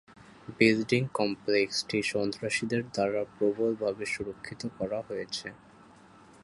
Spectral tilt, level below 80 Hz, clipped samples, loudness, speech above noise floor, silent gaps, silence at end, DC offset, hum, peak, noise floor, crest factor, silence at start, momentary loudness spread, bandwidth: -4.5 dB/octave; -64 dBFS; under 0.1%; -30 LUFS; 25 dB; none; 0.85 s; under 0.1%; none; -8 dBFS; -55 dBFS; 22 dB; 0.2 s; 13 LU; 11.5 kHz